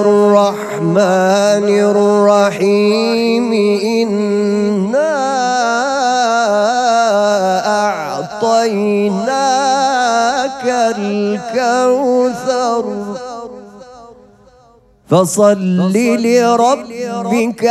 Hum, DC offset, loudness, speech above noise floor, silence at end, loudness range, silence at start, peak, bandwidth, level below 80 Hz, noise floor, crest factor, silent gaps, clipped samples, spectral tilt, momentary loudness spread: none; under 0.1%; -13 LUFS; 35 dB; 0 s; 5 LU; 0 s; 0 dBFS; 13.5 kHz; -56 dBFS; -48 dBFS; 12 dB; none; under 0.1%; -5 dB/octave; 6 LU